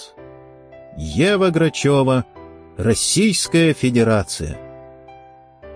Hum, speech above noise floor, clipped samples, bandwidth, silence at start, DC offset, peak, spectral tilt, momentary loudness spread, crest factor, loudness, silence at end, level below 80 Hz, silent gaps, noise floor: none; 28 dB; under 0.1%; 10.5 kHz; 0 s; under 0.1%; -4 dBFS; -4.5 dB/octave; 20 LU; 14 dB; -17 LUFS; 0 s; -42 dBFS; none; -45 dBFS